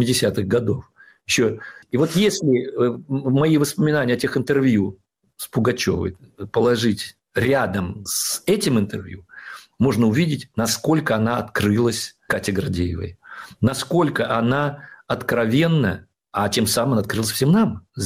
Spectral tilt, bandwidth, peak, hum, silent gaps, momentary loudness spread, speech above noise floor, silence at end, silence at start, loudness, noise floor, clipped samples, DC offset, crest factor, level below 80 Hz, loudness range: -5 dB/octave; 16 kHz; -8 dBFS; none; none; 11 LU; 20 dB; 0 s; 0 s; -21 LUFS; -40 dBFS; under 0.1%; under 0.1%; 12 dB; -50 dBFS; 2 LU